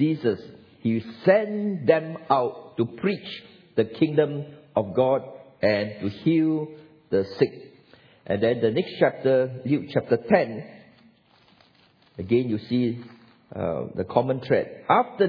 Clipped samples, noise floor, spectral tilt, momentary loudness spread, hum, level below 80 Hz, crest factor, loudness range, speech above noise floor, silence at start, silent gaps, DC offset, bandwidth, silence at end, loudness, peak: under 0.1%; -59 dBFS; -9.5 dB/octave; 9 LU; none; -64 dBFS; 20 dB; 3 LU; 36 dB; 0 s; none; under 0.1%; 5.4 kHz; 0 s; -25 LUFS; -4 dBFS